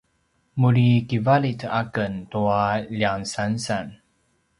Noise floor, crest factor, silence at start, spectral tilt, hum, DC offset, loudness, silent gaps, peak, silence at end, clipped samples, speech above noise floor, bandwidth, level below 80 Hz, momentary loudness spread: -68 dBFS; 18 dB; 0.55 s; -6.5 dB/octave; none; under 0.1%; -22 LUFS; none; -6 dBFS; 0.65 s; under 0.1%; 46 dB; 11.5 kHz; -54 dBFS; 9 LU